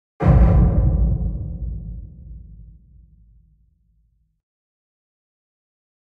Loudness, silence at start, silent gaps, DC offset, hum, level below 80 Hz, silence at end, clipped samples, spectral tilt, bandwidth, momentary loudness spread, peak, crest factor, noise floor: -19 LUFS; 0.2 s; none; under 0.1%; none; -24 dBFS; 3.5 s; under 0.1%; -11.5 dB/octave; 3.1 kHz; 27 LU; -2 dBFS; 18 dB; -63 dBFS